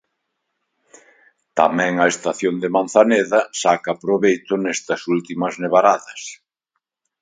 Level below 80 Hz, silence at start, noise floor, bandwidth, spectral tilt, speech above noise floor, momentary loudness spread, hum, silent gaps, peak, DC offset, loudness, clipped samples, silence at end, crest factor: -68 dBFS; 1.55 s; -77 dBFS; 9.6 kHz; -4.5 dB/octave; 59 dB; 9 LU; none; none; 0 dBFS; under 0.1%; -18 LUFS; under 0.1%; 0.85 s; 20 dB